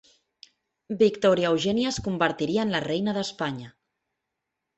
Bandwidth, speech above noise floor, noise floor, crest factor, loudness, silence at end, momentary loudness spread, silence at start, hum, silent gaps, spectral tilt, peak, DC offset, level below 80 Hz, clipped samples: 8.4 kHz; 59 dB; -83 dBFS; 20 dB; -25 LUFS; 1.05 s; 10 LU; 0.9 s; none; none; -5 dB/octave; -8 dBFS; under 0.1%; -58 dBFS; under 0.1%